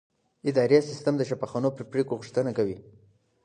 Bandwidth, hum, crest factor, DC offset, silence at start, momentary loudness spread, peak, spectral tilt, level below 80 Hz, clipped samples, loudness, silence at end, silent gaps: 9.8 kHz; none; 18 dB; under 0.1%; 0.45 s; 9 LU; -8 dBFS; -7 dB/octave; -66 dBFS; under 0.1%; -27 LUFS; 0.65 s; none